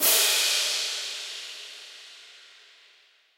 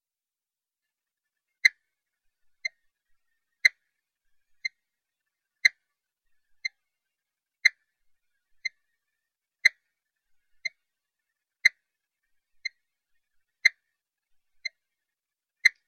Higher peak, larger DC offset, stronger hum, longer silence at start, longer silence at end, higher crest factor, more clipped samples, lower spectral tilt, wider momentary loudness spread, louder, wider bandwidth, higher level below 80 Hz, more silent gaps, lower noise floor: about the same, -8 dBFS vs -6 dBFS; neither; neither; second, 0 s vs 1.65 s; first, 1 s vs 0.2 s; second, 20 dB vs 28 dB; neither; about the same, 3.5 dB/octave vs 3.5 dB/octave; first, 25 LU vs 15 LU; first, -23 LUFS vs -26 LUFS; about the same, 16 kHz vs 15.5 kHz; second, under -90 dBFS vs -76 dBFS; neither; second, -60 dBFS vs under -90 dBFS